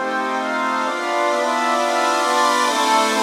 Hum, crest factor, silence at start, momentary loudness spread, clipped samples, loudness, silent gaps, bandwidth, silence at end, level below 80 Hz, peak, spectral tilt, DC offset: none; 14 dB; 0 s; 5 LU; under 0.1%; -18 LUFS; none; 16.5 kHz; 0 s; -68 dBFS; -4 dBFS; -1 dB/octave; under 0.1%